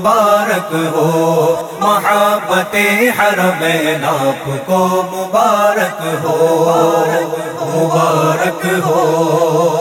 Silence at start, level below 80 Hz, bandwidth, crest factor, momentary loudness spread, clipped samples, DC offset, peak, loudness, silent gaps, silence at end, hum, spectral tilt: 0 s; -58 dBFS; 18.5 kHz; 12 dB; 5 LU; under 0.1%; under 0.1%; 0 dBFS; -13 LUFS; none; 0 s; none; -5 dB/octave